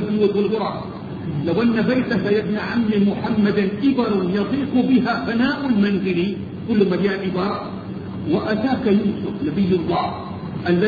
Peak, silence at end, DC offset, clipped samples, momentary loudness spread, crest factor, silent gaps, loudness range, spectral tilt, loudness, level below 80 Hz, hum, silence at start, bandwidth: -6 dBFS; 0 s; under 0.1%; under 0.1%; 9 LU; 14 dB; none; 2 LU; -9 dB/octave; -20 LUFS; -48 dBFS; none; 0 s; 6.6 kHz